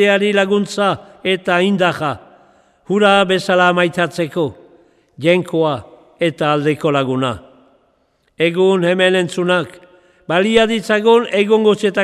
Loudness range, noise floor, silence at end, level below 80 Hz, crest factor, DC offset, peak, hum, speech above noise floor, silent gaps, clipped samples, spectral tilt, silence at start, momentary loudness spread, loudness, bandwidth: 4 LU; -61 dBFS; 0 s; -54 dBFS; 16 dB; under 0.1%; 0 dBFS; none; 46 dB; none; under 0.1%; -5.5 dB/octave; 0 s; 9 LU; -15 LUFS; 13 kHz